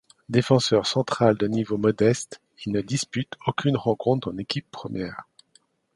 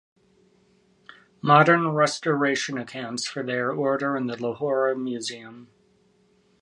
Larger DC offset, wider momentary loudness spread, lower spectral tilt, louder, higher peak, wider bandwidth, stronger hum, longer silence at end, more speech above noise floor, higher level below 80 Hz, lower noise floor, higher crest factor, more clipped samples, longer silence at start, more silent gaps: neither; about the same, 12 LU vs 14 LU; about the same, -5.5 dB/octave vs -5 dB/octave; about the same, -24 LUFS vs -23 LUFS; about the same, -4 dBFS vs -2 dBFS; about the same, 11.5 kHz vs 11.5 kHz; neither; second, 0.75 s vs 1 s; about the same, 39 dB vs 39 dB; first, -58 dBFS vs -74 dBFS; about the same, -63 dBFS vs -63 dBFS; about the same, 20 dB vs 22 dB; neither; second, 0.3 s vs 1.45 s; neither